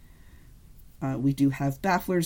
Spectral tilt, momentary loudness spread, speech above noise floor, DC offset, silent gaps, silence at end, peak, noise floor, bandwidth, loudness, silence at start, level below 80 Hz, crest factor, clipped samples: -6.5 dB/octave; 8 LU; 25 dB; under 0.1%; none; 0 s; -14 dBFS; -50 dBFS; 17 kHz; -27 LUFS; 0.25 s; -50 dBFS; 14 dB; under 0.1%